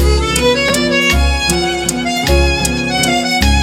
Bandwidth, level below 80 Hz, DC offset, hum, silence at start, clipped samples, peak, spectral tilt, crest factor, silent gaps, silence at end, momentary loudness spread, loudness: 17 kHz; -18 dBFS; under 0.1%; none; 0 s; under 0.1%; 0 dBFS; -3.5 dB/octave; 12 dB; none; 0 s; 4 LU; -13 LUFS